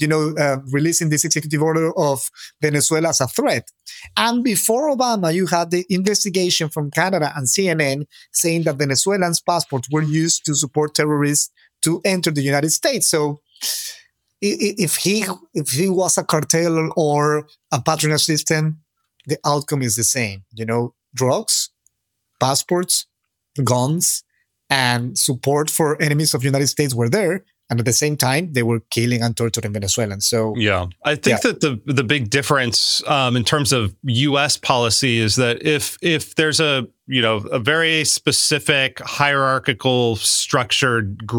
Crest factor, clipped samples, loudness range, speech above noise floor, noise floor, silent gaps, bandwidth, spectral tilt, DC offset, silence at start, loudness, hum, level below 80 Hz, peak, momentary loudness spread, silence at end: 18 dB; under 0.1%; 3 LU; 55 dB; -74 dBFS; none; 19.5 kHz; -3.5 dB/octave; under 0.1%; 0 s; -18 LUFS; none; -60 dBFS; 0 dBFS; 6 LU; 0 s